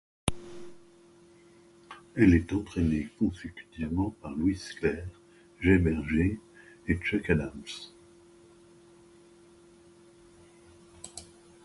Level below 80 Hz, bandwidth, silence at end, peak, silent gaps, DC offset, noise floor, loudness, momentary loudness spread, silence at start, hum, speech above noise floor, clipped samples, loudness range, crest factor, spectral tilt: -44 dBFS; 11.5 kHz; 0.4 s; -8 dBFS; none; under 0.1%; -57 dBFS; -29 LUFS; 23 LU; 0.25 s; none; 29 dB; under 0.1%; 6 LU; 22 dB; -6.5 dB/octave